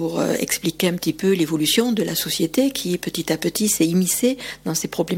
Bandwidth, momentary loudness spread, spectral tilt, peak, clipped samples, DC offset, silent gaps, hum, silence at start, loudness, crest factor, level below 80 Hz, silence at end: 18 kHz; 6 LU; -4 dB/octave; -4 dBFS; under 0.1%; under 0.1%; none; none; 0 s; -20 LUFS; 16 dB; -54 dBFS; 0 s